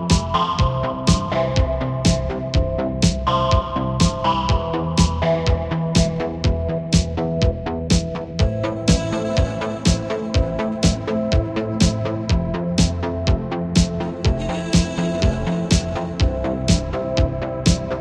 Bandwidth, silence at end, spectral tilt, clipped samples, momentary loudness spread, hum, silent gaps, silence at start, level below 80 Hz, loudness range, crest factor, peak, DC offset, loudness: 11.5 kHz; 0 s; -5.5 dB/octave; under 0.1%; 4 LU; none; none; 0 s; -26 dBFS; 1 LU; 16 dB; -2 dBFS; under 0.1%; -20 LUFS